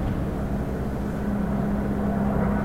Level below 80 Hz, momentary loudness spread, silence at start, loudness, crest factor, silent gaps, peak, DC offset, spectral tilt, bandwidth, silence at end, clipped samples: -32 dBFS; 5 LU; 0 s; -26 LUFS; 12 dB; none; -12 dBFS; 0.5%; -9 dB/octave; 15.5 kHz; 0 s; under 0.1%